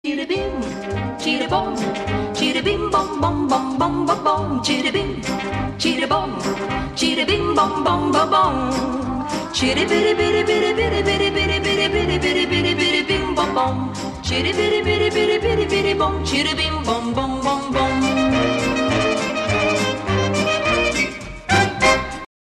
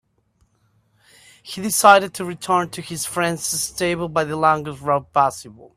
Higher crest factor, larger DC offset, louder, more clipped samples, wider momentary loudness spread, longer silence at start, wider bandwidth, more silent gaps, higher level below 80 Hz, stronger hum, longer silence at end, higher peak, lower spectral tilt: second, 16 dB vs 22 dB; neither; about the same, -19 LUFS vs -19 LUFS; neither; second, 7 LU vs 15 LU; second, 0.05 s vs 1.45 s; second, 13.5 kHz vs 16 kHz; neither; first, -38 dBFS vs -56 dBFS; neither; first, 0.35 s vs 0.1 s; about the same, -2 dBFS vs 0 dBFS; about the same, -4.5 dB/octave vs -3.5 dB/octave